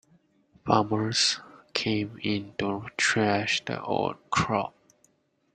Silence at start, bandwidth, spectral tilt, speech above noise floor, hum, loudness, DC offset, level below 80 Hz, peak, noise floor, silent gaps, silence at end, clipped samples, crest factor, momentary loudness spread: 0.65 s; 9.6 kHz; -3.5 dB/octave; 40 dB; none; -27 LUFS; under 0.1%; -60 dBFS; -4 dBFS; -67 dBFS; none; 0.85 s; under 0.1%; 24 dB; 8 LU